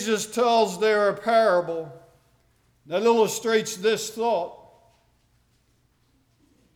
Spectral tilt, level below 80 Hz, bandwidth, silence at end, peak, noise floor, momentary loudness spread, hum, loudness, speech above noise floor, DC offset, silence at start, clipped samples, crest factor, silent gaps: -3 dB/octave; -70 dBFS; 18.5 kHz; 2.2 s; -8 dBFS; -65 dBFS; 11 LU; 60 Hz at -65 dBFS; -23 LUFS; 43 dB; under 0.1%; 0 s; under 0.1%; 16 dB; none